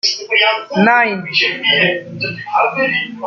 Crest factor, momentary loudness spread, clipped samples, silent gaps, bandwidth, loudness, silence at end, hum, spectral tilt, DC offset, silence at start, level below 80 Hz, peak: 14 dB; 7 LU; under 0.1%; none; 7.4 kHz; -14 LUFS; 0 s; none; -3.5 dB/octave; under 0.1%; 0.05 s; -62 dBFS; -2 dBFS